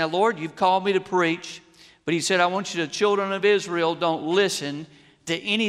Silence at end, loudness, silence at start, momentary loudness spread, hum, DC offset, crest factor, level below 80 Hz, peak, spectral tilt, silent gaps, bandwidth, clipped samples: 0 s; -23 LUFS; 0 s; 12 LU; none; under 0.1%; 16 dB; -70 dBFS; -6 dBFS; -4 dB/octave; none; 14 kHz; under 0.1%